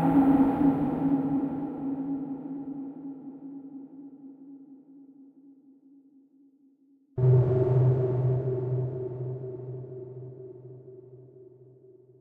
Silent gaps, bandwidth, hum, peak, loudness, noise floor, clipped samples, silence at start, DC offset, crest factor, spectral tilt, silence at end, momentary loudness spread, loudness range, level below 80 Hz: none; 3.3 kHz; none; -10 dBFS; -27 LUFS; -62 dBFS; under 0.1%; 0 s; under 0.1%; 18 dB; -12 dB/octave; 0.75 s; 25 LU; 19 LU; -58 dBFS